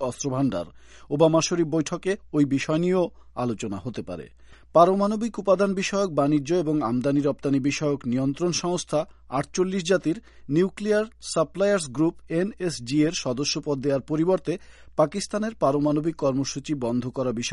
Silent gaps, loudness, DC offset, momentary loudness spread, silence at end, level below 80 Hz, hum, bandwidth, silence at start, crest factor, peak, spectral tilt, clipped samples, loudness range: none; -25 LUFS; under 0.1%; 8 LU; 0 s; -54 dBFS; none; 11.5 kHz; 0 s; 20 dB; -4 dBFS; -5.5 dB/octave; under 0.1%; 3 LU